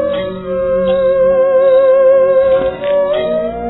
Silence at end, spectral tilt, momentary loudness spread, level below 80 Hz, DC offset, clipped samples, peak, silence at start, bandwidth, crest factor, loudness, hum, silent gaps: 0 s; -10 dB/octave; 9 LU; -40 dBFS; under 0.1%; under 0.1%; -2 dBFS; 0 s; 4.1 kHz; 10 dB; -12 LUFS; none; none